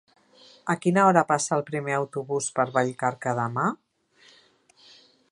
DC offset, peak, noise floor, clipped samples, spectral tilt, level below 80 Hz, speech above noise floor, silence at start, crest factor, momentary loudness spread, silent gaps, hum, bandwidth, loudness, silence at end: under 0.1%; -4 dBFS; -59 dBFS; under 0.1%; -5 dB/octave; -74 dBFS; 35 dB; 0.65 s; 22 dB; 10 LU; none; none; 11.5 kHz; -25 LUFS; 1.55 s